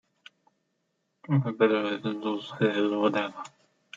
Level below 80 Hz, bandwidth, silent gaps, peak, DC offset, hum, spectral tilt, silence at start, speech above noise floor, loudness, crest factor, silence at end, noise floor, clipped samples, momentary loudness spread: -78 dBFS; 7.8 kHz; none; -10 dBFS; under 0.1%; none; -7.5 dB/octave; 1.3 s; 50 dB; -27 LUFS; 20 dB; 0.5 s; -77 dBFS; under 0.1%; 10 LU